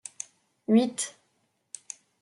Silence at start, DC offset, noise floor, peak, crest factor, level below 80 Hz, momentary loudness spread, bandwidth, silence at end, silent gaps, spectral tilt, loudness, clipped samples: 0.7 s; under 0.1%; -73 dBFS; -10 dBFS; 20 dB; -82 dBFS; 21 LU; 12 kHz; 1.1 s; none; -4.5 dB/octave; -26 LUFS; under 0.1%